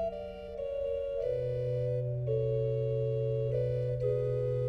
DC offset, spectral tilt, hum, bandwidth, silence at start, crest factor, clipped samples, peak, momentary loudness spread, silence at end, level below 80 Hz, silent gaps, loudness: under 0.1%; -10 dB/octave; none; 5 kHz; 0 s; 12 dB; under 0.1%; -20 dBFS; 6 LU; 0 s; -52 dBFS; none; -33 LUFS